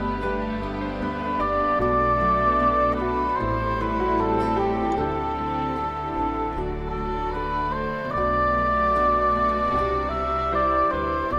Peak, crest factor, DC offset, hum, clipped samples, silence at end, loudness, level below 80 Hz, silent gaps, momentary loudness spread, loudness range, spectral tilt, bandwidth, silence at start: -10 dBFS; 14 dB; under 0.1%; none; under 0.1%; 0 s; -23 LUFS; -36 dBFS; none; 8 LU; 4 LU; -8 dB/octave; 9.6 kHz; 0 s